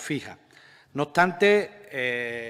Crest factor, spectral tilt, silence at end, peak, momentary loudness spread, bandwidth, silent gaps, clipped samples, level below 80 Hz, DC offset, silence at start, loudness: 20 dB; -5 dB/octave; 0 s; -6 dBFS; 15 LU; 15 kHz; none; under 0.1%; -68 dBFS; under 0.1%; 0 s; -24 LUFS